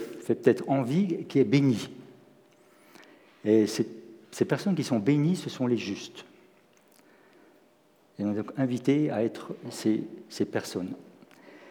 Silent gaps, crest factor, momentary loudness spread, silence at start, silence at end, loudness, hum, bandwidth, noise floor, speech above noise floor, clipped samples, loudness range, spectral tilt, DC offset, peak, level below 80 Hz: none; 24 dB; 16 LU; 0 s; 0 s; -28 LUFS; none; 18.5 kHz; -63 dBFS; 36 dB; under 0.1%; 5 LU; -6.5 dB/octave; under 0.1%; -6 dBFS; -82 dBFS